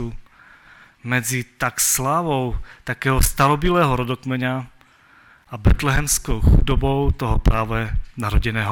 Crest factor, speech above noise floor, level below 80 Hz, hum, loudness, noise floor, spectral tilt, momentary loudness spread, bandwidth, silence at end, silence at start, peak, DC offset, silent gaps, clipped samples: 18 dB; 33 dB; -24 dBFS; none; -20 LUFS; -52 dBFS; -4.5 dB/octave; 11 LU; 17.5 kHz; 0 s; 0 s; -2 dBFS; under 0.1%; none; under 0.1%